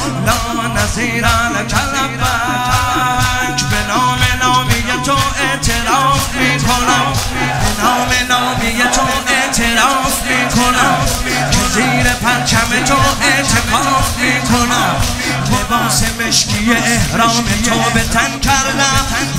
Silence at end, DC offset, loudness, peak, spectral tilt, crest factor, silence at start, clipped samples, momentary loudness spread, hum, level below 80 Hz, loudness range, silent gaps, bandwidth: 0 s; 0.3%; -13 LUFS; 0 dBFS; -3 dB/octave; 14 dB; 0 s; under 0.1%; 4 LU; none; -26 dBFS; 2 LU; none; 16.5 kHz